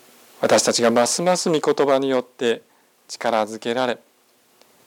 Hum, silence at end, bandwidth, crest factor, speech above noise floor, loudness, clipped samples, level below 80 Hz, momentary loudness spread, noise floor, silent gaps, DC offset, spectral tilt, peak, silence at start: none; 0.9 s; 18.5 kHz; 16 dB; 39 dB; -20 LUFS; under 0.1%; -74 dBFS; 9 LU; -59 dBFS; none; under 0.1%; -3 dB/octave; -6 dBFS; 0.4 s